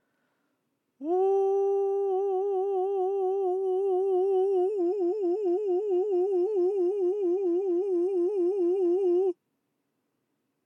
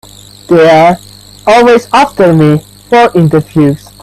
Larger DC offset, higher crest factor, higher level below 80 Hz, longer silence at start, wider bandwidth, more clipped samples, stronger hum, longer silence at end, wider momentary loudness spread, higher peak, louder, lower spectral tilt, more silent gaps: neither; about the same, 8 dB vs 8 dB; second, under -90 dBFS vs -40 dBFS; first, 1 s vs 0.5 s; second, 3.2 kHz vs 14 kHz; second, under 0.1% vs 0.3%; neither; first, 1.3 s vs 0.25 s; second, 3 LU vs 6 LU; second, -18 dBFS vs 0 dBFS; second, -27 LUFS vs -7 LUFS; about the same, -6.5 dB/octave vs -6.5 dB/octave; neither